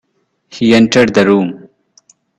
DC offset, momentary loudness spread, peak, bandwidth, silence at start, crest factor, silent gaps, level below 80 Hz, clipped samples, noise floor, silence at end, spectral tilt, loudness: under 0.1%; 8 LU; 0 dBFS; 11 kHz; 0.55 s; 14 dB; none; -48 dBFS; under 0.1%; -61 dBFS; 0.8 s; -5.5 dB/octave; -11 LUFS